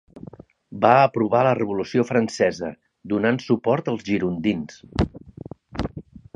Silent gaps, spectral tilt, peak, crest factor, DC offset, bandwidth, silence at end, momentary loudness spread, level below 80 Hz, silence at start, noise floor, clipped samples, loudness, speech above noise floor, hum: none; -6.5 dB/octave; 0 dBFS; 22 dB; under 0.1%; 10 kHz; 0.2 s; 23 LU; -44 dBFS; 0.15 s; -43 dBFS; under 0.1%; -22 LUFS; 22 dB; none